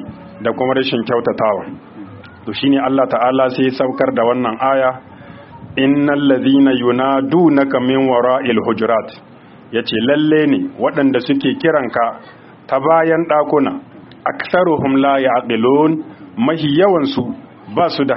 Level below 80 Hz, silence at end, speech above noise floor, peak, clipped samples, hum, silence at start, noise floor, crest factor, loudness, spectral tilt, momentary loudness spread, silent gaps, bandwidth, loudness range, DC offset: -56 dBFS; 0 s; 22 dB; 0 dBFS; under 0.1%; none; 0 s; -36 dBFS; 14 dB; -15 LUFS; -4.5 dB/octave; 11 LU; none; 5.8 kHz; 3 LU; under 0.1%